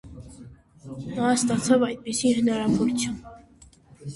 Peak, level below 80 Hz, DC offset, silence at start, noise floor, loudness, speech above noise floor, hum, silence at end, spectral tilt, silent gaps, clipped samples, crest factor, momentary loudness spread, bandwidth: -8 dBFS; -54 dBFS; under 0.1%; 0.05 s; -53 dBFS; -24 LUFS; 30 dB; none; 0 s; -4.5 dB/octave; none; under 0.1%; 18 dB; 21 LU; 11.5 kHz